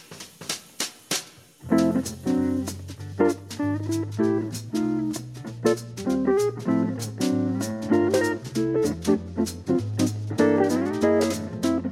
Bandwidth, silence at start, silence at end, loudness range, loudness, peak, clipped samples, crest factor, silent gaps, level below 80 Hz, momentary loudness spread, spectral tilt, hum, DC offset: 16 kHz; 0.1 s; 0 s; 3 LU; -25 LUFS; -8 dBFS; under 0.1%; 18 dB; none; -56 dBFS; 10 LU; -5.5 dB/octave; none; under 0.1%